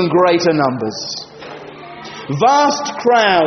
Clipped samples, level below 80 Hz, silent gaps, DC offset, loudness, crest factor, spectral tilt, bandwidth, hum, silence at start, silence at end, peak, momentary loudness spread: under 0.1%; -58 dBFS; none; under 0.1%; -15 LUFS; 14 dB; -3.5 dB/octave; 6.6 kHz; none; 0 s; 0 s; 0 dBFS; 20 LU